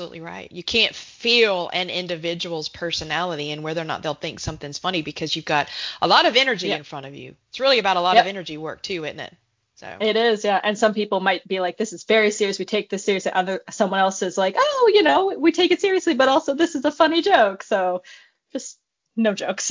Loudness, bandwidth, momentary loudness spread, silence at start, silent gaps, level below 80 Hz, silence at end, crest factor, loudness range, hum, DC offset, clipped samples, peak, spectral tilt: -20 LUFS; 7.6 kHz; 15 LU; 0 s; none; -56 dBFS; 0 s; 20 dB; 6 LU; none; under 0.1%; under 0.1%; 0 dBFS; -3.5 dB/octave